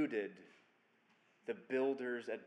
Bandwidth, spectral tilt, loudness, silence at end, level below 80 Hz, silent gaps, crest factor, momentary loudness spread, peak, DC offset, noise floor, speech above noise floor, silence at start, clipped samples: 9.4 kHz; -6.5 dB/octave; -41 LUFS; 0 s; under -90 dBFS; none; 16 dB; 14 LU; -26 dBFS; under 0.1%; -74 dBFS; 33 dB; 0 s; under 0.1%